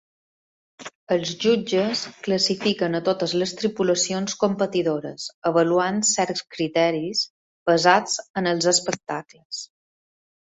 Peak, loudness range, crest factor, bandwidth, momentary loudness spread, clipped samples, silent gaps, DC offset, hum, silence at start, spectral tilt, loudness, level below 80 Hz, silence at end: -2 dBFS; 2 LU; 22 dB; 8.2 kHz; 13 LU; under 0.1%; 0.95-1.07 s, 5.34-5.42 s, 7.30-7.66 s, 8.30-8.34 s, 9.45-9.50 s; under 0.1%; none; 0.8 s; -3.5 dB/octave; -22 LUFS; -66 dBFS; 0.8 s